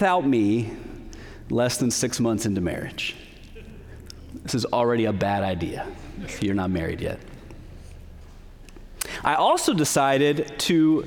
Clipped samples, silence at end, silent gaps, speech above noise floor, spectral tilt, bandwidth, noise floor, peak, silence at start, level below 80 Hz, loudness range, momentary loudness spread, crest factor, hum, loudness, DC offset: under 0.1%; 0 s; none; 21 dB; -4.5 dB/octave; over 20 kHz; -43 dBFS; -6 dBFS; 0 s; -46 dBFS; 6 LU; 24 LU; 20 dB; none; -24 LUFS; under 0.1%